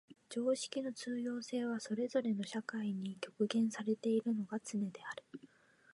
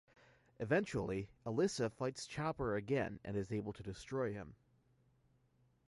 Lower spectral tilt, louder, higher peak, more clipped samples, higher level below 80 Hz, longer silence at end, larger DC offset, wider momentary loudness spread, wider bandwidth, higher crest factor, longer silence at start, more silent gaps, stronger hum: about the same, -5 dB/octave vs -6 dB/octave; about the same, -39 LUFS vs -40 LUFS; about the same, -22 dBFS vs -22 dBFS; neither; second, -88 dBFS vs -64 dBFS; second, 0.5 s vs 1.35 s; neither; about the same, 10 LU vs 10 LU; about the same, 11.5 kHz vs 11.5 kHz; about the same, 16 dB vs 20 dB; second, 0.1 s vs 0.6 s; neither; neither